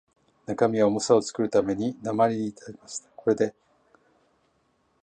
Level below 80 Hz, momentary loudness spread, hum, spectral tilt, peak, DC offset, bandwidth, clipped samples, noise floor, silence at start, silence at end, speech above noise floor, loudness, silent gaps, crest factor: -64 dBFS; 15 LU; none; -5.5 dB/octave; -6 dBFS; under 0.1%; 9.8 kHz; under 0.1%; -69 dBFS; 0.5 s; 1.5 s; 44 dB; -25 LUFS; none; 20 dB